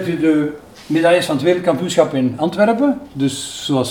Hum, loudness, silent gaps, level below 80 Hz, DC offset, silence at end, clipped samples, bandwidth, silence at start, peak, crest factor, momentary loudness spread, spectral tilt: none; -17 LUFS; none; -54 dBFS; 0.1%; 0 s; under 0.1%; 18 kHz; 0 s; 0 dBFS; 16 dB; 7 LU; -5.5 dB/octave